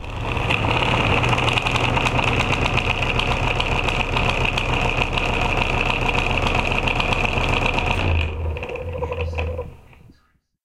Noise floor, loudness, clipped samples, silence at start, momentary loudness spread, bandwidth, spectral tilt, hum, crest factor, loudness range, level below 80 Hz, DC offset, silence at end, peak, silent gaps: -61 dBFS; -20 LUFS; under 0.1%; 0 s; 8 LU; 13.5 kHz; -5 dB/octave; none; 18 dB; 3 LU; -28 dBFS; under 0.1%; 0.85 s; -4 dBFS; none